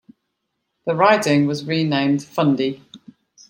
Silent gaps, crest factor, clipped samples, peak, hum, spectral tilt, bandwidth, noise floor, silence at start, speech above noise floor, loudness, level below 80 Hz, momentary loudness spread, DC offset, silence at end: none; 18 dB; under 0.1%; -2 dBFS; none; -6 dB/octave; 16.5 kHz; -75 dBFS; 0.85 s; 57 dB; -19 LUFS; -66 dBFS; 10 LU; under 0.1%; 0.55 s